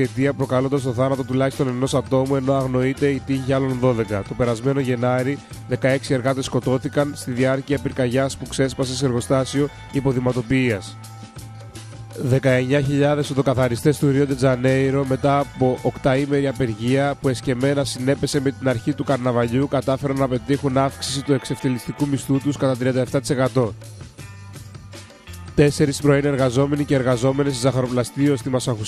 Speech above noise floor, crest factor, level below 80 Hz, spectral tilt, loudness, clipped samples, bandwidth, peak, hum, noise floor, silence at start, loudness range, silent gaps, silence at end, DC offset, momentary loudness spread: 20 dB; 16 dB; -46 dBFS; -6.5 dB/octave; -21 LUFS; under 0.1%; 14 kHz; -4 dBFS; none; -40 dBFS; 0 s; 3 LU; none; 0 s; under 0.1%; 9 LU